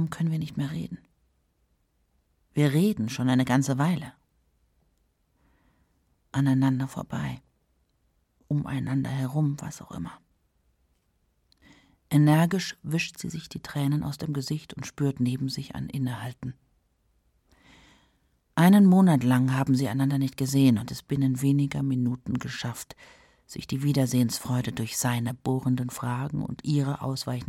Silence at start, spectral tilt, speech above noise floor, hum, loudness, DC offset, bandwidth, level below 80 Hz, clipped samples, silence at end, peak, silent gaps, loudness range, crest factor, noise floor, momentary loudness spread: 0 s; -6.5 dB/octave; 45 dB; none; -26 LUFS; under 0.1%; 16.5 kHz; -58 dBFS; under 0.1%; 0 s; -8 dBFS; none; 9 LU; 20 dB; -71 dBFS; 15 LU